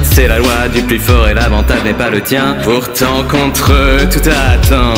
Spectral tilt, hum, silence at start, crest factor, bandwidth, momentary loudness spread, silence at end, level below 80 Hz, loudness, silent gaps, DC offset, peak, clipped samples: -5 dB/octave; none; 0 s; 10 dB; 16.5 kHz; 3 LU; 0 s; -14 dBFS; -10 LUFS; none; under 0.1%; 0 dBFS; 0.3%